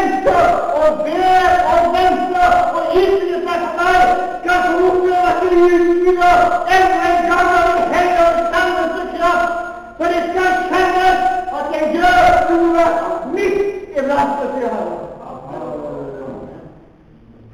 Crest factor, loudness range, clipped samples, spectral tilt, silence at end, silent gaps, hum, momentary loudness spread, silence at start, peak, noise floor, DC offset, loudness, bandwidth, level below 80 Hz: 12 dB; 8 LU; under 0.1%; -4.5 dB/octave; 0.85 s; none; none; 13 LU; 0 s; -2 dBFS; -44 dBFS; under 0.1%; -14 LUFS; 15.5 kHz; -38 dBFS